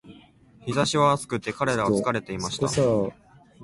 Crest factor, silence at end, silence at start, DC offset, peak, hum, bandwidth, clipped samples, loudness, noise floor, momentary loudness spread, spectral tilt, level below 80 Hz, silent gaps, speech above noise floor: 16 dB; 0 s; 0.05 s; under 0.1%; -8 dBFS; none; 11.5 kHz; under 0.1%; -24 LUFS; -53 dBFS; 9 LU; -5 dB/octave; -54 dBFS; none; 29 dB